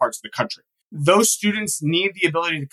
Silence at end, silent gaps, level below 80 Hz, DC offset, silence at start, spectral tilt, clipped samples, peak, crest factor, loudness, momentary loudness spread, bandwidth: 0.05 s; 0.82-0.90 s; -68 dBFS; under 0.1%; 0 s; -3.5 dB/octave; under 0.1%; -2 dBFS; 20 dB; -20 LUFS; 11 LU; 12.5 kHz